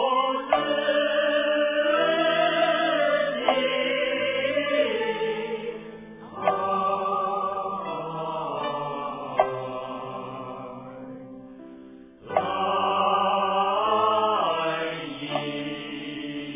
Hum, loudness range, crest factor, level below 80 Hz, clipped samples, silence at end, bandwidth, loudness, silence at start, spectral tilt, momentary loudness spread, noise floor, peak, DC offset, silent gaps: none; 9 LU; 20 dB; -64 dBFS; under 0.1%; 0 s; 3.8 kHz; -25 LUFS; 0 s; -8 dB/octave; 16 LU; -46 dBFS; -6 dBFS; under 0.1%; none